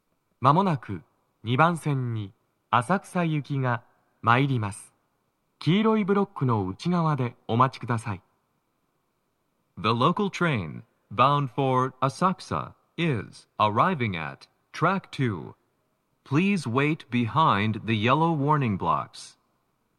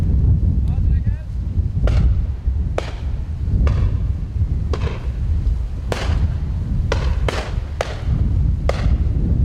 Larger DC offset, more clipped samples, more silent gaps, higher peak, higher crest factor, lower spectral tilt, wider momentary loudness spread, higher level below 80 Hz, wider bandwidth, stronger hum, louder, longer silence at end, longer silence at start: neither; neither; neither; about the same, -4 dBFS vs -2 dBFS; first, 22 dB vs 16 dB; about the same, -7 dB/octave vs -7.5 dB/octave; first, 14 LU vs 7 LU; second, -66 dBFS vs -20 dBFS; first, 12 kHz vs 9 kHz; neither; second, -25 LUFS vs -21 LUFS; first, 0.7 s vs 0 s; first, 0.4 s vs 0 s